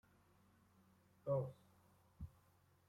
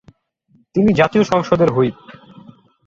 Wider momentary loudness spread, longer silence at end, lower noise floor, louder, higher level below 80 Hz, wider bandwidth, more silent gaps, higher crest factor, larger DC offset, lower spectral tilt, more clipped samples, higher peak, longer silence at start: first, 16 LU vs 6 LU; second, 0.6 s vs 0.75 s; first, -74 dBFS vs -58 dBFS; second, -45 LUFS vs -16 LUFS; second, -70 dBFS vs -50 dBFS; first, 16 kHz vs 7.6 kHz; neither; about the same, 22 dB vs 18 dB; neither; first, -9.5 dB/octave vs -7 dB/octave; neither; second, -30 dBFS vs 0 dBFS; first, 1.25 s vs 0.75 s